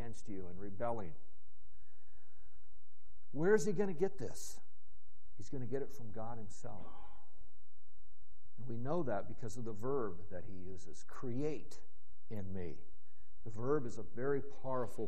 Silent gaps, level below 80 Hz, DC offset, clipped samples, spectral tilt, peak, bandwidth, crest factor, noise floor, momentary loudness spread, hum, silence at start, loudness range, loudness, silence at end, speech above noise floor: none; -64 dBFS; 3%; under 0.1%; -6.5 dB/octave; -18 dBFS; 11.5 kHz; 24 dB; -70 dBFS; 17 LU; none; 0 s; 10 LU; -41 LUFS; 0 s; 29 dB